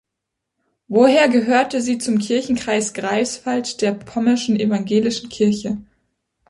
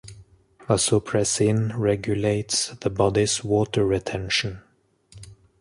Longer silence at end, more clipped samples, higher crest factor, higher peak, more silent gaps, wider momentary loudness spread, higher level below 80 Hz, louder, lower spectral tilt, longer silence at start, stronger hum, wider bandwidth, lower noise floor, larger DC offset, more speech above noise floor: first, 0.65 s vs 0.3 s; neither; about the same, 16 dB vs 18 dB; first, -2 dBFS vs -6 dBFS; neither; first, 8 LU vs 4 LU; second, -58 dBFS vs -48 dBFS; first, -18 LUFS vs -23 LUFS; about the same, -4.5 dB/octave vs -4.5 dB/octave; first, 0.9 s vs 0.05 s; neither; about the same, 11.5 kHz vs 11.5 kHz; first, -80 dBFS vs -59 dBFS; neither; first, 62 dB vs 36 dB